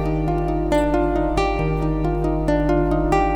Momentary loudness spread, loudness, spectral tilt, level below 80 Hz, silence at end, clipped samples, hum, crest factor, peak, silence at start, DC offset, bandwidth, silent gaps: 3 LU; -20 LUFS; -7.5 dB/octave; -26 dBFS; 0 s; under 0.1%; none; 12 dB; -6 dBFS; 0 s; under 0.1%; 11 kHz; none